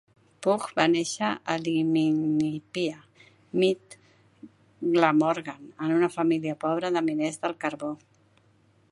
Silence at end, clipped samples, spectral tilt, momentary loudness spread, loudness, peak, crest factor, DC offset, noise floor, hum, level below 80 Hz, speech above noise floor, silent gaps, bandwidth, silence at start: 0.95 s; under 0.1%; -5.5 dB/octave; 10 LU; -26 LUFS; -4 dBFS; 22 dB; under 0.1%; -63 dBFS; none; -74 dBFS; 37 dB; none; 11.5 kHz; 0.4 s